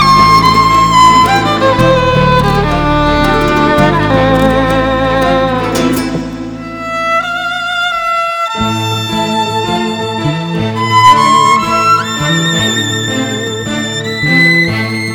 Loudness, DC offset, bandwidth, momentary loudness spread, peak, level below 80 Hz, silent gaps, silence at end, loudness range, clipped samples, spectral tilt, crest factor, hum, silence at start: -10 LUFS; 0.2%; over 20 kHz; 10 LU; 0 dBFS; -28 dBFS; none; 0 s; 5 LU; 0.7%; -4.5 dB/octave; 10 dB; none; 0 s